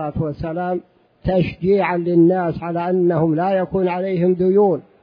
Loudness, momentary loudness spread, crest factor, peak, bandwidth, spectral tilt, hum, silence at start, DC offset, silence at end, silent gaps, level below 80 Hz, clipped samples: -18 LUFS; 9 LU; 14 dB; -4 dBFS; 5.2 kHz; -11 dB/octave; none; 0 s; under 0.1%; 0.2 s; none; -44 dBFS; under 0.1%